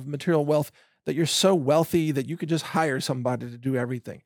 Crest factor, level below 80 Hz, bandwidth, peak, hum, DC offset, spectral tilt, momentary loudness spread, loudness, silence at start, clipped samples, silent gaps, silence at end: 16 dB; -68 dBFS; over 20 kHz; -8 dBFS; none; under 0.1%; -5 dB/octave; 10 LU; -25 LUFS; 0 s; under 0.1%; none; 0.05 s